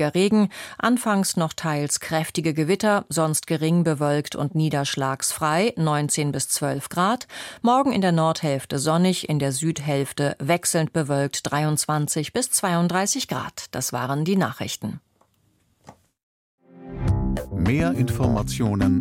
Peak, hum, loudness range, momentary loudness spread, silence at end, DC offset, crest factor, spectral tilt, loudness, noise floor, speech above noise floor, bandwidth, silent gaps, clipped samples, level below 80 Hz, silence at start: -8 dBFS; none; 6 LU; 6 LU; 0 s; under 0.1%; 16 dB; -5 dB/octave; -23 LUFS; -65 dBFS; 42 dB; 16.5 kHz; 16.23-16.58 s; under 0.1%; -42 dBFS; 0 s